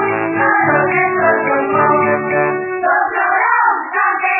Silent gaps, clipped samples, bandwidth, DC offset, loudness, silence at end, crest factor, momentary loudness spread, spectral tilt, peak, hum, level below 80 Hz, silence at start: none; under 0.1%; 3 kHz; under 0.1%; -14 LUFS; 0 s; 14 dB; 3 LU; -10.5 dB/octave; -2 dBFS; none; -62 dBFS; 0 s